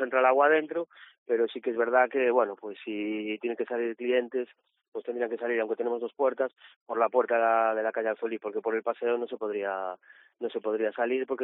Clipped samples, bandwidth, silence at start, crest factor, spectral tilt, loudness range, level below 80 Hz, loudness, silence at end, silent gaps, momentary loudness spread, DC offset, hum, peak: under 0.1%; 4 kHz; 0 s; 18 dB; -2 dB/octave; 4 LU; -84 dBFS; -29 LUFS; 0 s; 1.18-1.26 s, 4.88-4.92 s, 6.76-6.86 s; 12 LU; under 0.1%; none; -10 dBFS